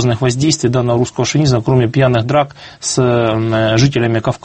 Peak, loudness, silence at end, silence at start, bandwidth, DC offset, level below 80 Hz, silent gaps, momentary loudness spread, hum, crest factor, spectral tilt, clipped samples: 0 dBFS; -14 LUFS; 0.05 s; 0 s; 8.8 kHz; under 0.1%; -42 dBFS; none; 4 LU; none; 14 dB; -5.5 dB/octave; under 0.1%